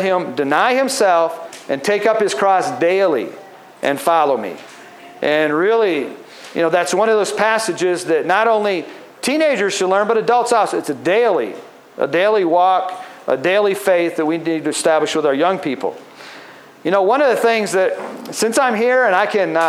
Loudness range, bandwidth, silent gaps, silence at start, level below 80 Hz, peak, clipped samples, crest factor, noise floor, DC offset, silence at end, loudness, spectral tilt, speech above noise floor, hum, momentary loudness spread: 2 LU; 15.5 kHz; none; 0 s; -76 dBFS; -2 dBFS; under 0.1%; 14 dB; -39 dBFS; under 0.1%; 0 s; -16 LUFS; -3.5 dB/octave; 23 dB; none; 12 LU